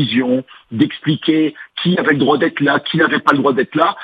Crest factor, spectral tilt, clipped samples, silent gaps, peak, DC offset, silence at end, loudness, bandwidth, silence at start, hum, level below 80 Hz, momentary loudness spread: 16 dB; -7.5 dB/octave; under 0.1%; none; 0 dBFS; under 0.1%; 0 s; -15 LUFS; 6.6 kHz; 0 s; none; -60 dBFS; 6 LU